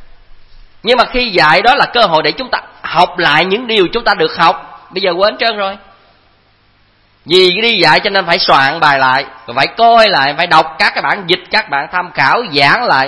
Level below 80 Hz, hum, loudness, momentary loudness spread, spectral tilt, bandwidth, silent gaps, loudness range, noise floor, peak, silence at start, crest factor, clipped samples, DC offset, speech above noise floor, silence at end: -40 dBFS; none; -10 LUFS; 9 LU; -4.5 dB/octave; 11 kHz; none; 5 LU; -51 dBFS; 0 dBFS; 0 s; 12 dB; 0.5%; under 0.1%; 40 dB; 0 s